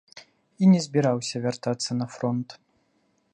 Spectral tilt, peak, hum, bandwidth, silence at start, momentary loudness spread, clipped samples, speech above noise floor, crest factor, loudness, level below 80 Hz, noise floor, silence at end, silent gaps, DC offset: -6 dB/octave; -8 dBFS; none; 9.8 kHz; 0.15 s; 9 LU; under 0.1%; 45 dB; 18 dB; -25 LUFS; -70 dBFS; -69 dBFS; 0.8 s; none; under 0.1%